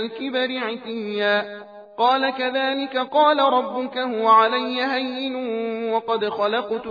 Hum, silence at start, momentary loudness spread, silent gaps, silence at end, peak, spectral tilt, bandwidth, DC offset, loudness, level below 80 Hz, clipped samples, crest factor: none; 0 s; 10 LU; none; 0 s; -4 dBFS; -5.5 dB/octave; 5 kHz; under 0.1%; -21 LUFS; -76 dBFS; under 0.1%; 16 dB